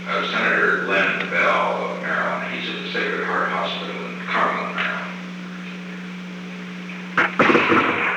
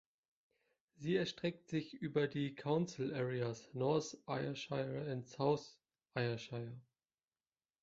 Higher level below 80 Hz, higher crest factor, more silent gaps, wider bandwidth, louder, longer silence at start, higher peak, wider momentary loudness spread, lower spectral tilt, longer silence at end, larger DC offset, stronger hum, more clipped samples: first, -66 dBFS vs -76 dBFS; about the same, 18 dB vs 20 dB; neither; first, 10.5 kHz vs 7.6 kHz; first, -20 LUFS vs -40 LUFS; second, 0 s vs 1 s; first, -4 dBFS vs -22 dBFS; first, 16 LU vs 10 LU; about the same, -5 dB/octave vs -5.5 dB/octave; second, 0 s vs 1 s; neither; neither; neither